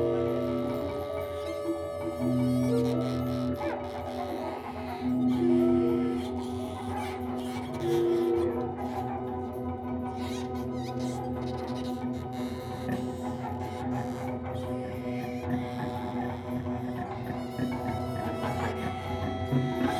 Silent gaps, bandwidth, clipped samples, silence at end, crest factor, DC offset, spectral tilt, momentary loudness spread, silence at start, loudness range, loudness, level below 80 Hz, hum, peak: none; 14 kHz; under 0.1%; 0 s; 16 dB; under 0.1%; -7.5 dB/octave; 8 LU; 0 s; 5 LU; -31 LUFS; -54 dBFS; none; -14 dBFS